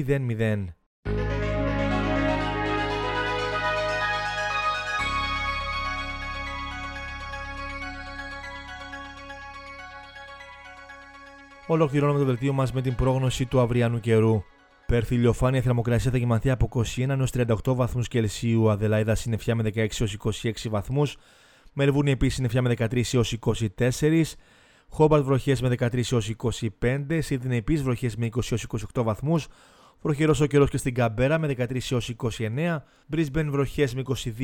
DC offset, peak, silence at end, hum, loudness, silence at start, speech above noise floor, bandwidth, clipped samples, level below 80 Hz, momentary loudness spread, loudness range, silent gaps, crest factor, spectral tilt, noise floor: under 0.1%; -8 dBFS; 0 s; none; -25 LUFS; 0 s; 23 dB; 16.5 kHz; under 0.1%; -40 dBFS; 15 LU; 9 LU; 0.86-1.03 s; 18 dB; -6 dB/octave; -47 dBFS